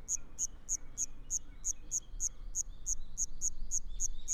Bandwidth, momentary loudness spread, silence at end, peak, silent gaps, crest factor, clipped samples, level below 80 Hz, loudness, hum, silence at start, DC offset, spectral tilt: 13.5 kHz; 3 LU; 0 s; -20 dBFS; none; 16 dB; under 0.1%; -44 dBFS; -37 LUFS; none; 0 s; under 0.1%; -1 dB/octave